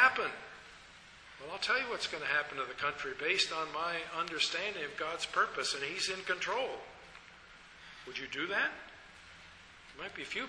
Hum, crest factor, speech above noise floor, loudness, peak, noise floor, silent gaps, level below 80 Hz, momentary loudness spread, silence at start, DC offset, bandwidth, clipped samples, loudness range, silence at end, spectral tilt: none; 24 dB; 20 dB; -34 LUFS; -12 dBFS; -56 dBFS; none; -68 dBFS; 21 LU; 0 s; under 0.1%; 11 kHz; under 0.1%; 6 LU; 0 s; -1 dB/octave